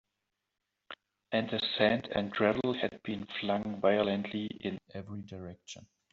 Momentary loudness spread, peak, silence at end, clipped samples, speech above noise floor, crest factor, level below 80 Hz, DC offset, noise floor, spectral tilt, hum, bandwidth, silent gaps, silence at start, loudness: 20 LU; -12 dBFS; 0.3 s; under 0.1%; 53 dB; 22 dB; -66 dBFS; under 0.1%; -86 dBFS; -3.5 dB/octave; none; 7.6 kHz; none; 0.9 s; -32 LUFS